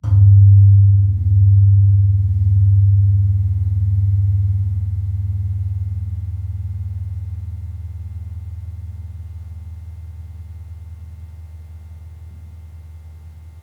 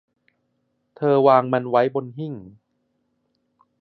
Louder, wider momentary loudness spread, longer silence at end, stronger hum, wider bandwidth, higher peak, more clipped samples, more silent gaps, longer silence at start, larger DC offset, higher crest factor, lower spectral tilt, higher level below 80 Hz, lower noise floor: first, -15 LUFS vs -19 LUFS; first, 25 LU vs 17 LU; second, 0 s vs 1.3 s; first, 50 Hz at -30 dBFS vs none; second, 0.9 kHz vs 5.8 kHz; about the same, -2 dBFS vs -2 dBFS; neither; neither; second, 0.05 s vs 1 s; neither; second, 14 dB vs 22 dB; about the same, -10.5 dB/octave vs -9.5 dB/octave; first, -32 dBFS vs -70 dBFS; second, -37 dBFS vs -71 dBFS